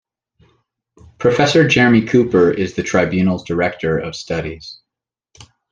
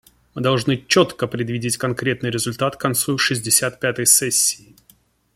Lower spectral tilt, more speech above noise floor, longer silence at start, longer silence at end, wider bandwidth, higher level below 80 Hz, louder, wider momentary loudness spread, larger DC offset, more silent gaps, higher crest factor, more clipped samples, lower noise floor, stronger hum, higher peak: first, -6 dB/octave vs -3 dB/octave; first, 69 dB vs 37 dB; first, 1.2 s vs 0.35 s; first, 0.95 s vs 0.8 s; second, 9.8 kHz vs 16.5 kHz; first, -48 dBFS vs -56 dBFS; first, -15 LUFS vs -18 LUFS; about the same, 12 LU vs 10 LU; neither; neither; about the same, 16 dB vs 20 dB; neither; first, -84 dBFS vs -56 dBFS; neither; about the same, -2 dBFS vs 0 dBFS